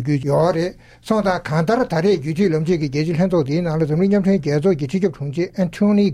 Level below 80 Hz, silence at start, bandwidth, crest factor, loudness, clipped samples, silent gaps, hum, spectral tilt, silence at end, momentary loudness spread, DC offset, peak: -46 dBFS; 0 s; 11.5 kHz; 14 dB; -19 LUFS; under 0.1%; none; none; -7.5 dB/octave; 0 s; 5 LU; under 0.1%; -4 dBFS